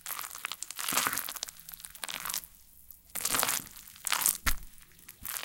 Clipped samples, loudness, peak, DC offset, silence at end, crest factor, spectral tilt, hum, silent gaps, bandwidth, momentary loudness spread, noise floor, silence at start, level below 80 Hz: under 0.1%; -32 LUFS; -4 dBFS; under 0.1%; 0 s; 30 dB; 0 dB/octave; none; none; 17 kHz; 20 LU; -55 dBFS; 0.05 s; -48 dBFS